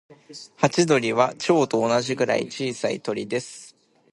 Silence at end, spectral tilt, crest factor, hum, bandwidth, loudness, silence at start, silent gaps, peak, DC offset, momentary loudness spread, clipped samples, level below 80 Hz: 0.45 s; -4.5 dB/octave; 22 dB; none; 11.5 kHz; -23 LUFS; 0.1 s; none; -2 dBFS; under 0.1%; 20 LU; under 0.1%; -68 dBFS